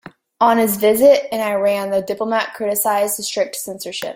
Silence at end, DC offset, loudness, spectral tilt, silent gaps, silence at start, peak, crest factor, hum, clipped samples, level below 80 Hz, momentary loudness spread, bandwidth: 0 s; under 0.1%; -17 LUFS; -3 dB/octave; none; 0.4 s; -2 dBFS; 16 dB; none; under 0.1%; -60 dBFS; 10 LU; 16.5 kHz